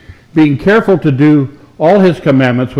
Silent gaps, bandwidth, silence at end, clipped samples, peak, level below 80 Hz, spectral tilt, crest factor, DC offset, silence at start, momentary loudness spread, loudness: none; 7.6 kHz; 0 s; under 0.1%; 0 dBFS; -42 dBFS; -8.5 dB/octave; 10 dB; under 0.1%; 0.1 s; 5 LU; -10 LUFS